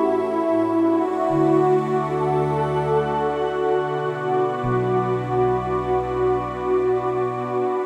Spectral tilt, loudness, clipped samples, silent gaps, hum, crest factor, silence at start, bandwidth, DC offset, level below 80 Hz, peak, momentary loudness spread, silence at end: -8.5 dB/octave; -21 LUFS; under 0.1%; none; none; 12 dB; 0 s; 9 kHz; under 0.1%; -46 dBFS; -8 dBFS; 4 LU; 0 s